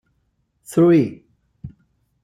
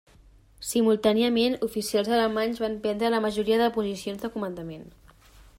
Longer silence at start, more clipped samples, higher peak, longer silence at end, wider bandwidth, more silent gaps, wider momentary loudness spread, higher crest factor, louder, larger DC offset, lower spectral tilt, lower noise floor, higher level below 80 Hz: about the same, 0.7 s vs 0.6 s; neither; about the same, -6 dBFS vs -8 dBFS; first, 0.55 s vs 0.15 s; second, 14 kHz vs 16 kHz; neither; first, 26 LU vs 12 LU; about the same, 16 dB vs 18 dB; first, -17 LUFS vs -25 LUFS; neither; first, -8 dB/octave vs -4.5 dB/octave; first, -68 dBFS vs -55 dBFS; about the same, -58 dBFS vs -56 dBFS